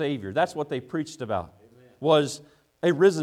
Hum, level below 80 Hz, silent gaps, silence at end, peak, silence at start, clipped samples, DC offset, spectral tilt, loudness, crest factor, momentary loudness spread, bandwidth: none; -64 dBFS; none; 0 s; -8 dBFS; 0 s; under 0.1%; under 0.1%; -5.5 dB/octave; -26 LUFS; 18 dB; 11 LU; 13.5 kHz